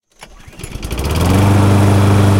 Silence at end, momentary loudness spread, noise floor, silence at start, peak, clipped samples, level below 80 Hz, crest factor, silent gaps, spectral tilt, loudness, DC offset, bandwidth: 0 s; 18 LU; -38 dBFS; 0.2 s; 0 dBFS; under 0.1%; -26 dBFS; 12 dB; none; -6.5 dB/octave; -12 LUFS; under 0.1%; 16.5 kHz